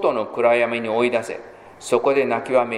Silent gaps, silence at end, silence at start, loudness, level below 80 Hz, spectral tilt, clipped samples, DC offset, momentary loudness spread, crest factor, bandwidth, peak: none; 0 s; 0 s; -20 LUFS; -64 dBFS; -4.5 dB/octave; under 0.1%; under 0.1%; 13 LU; 16 dB; 13.5 kHz; -4 dBFS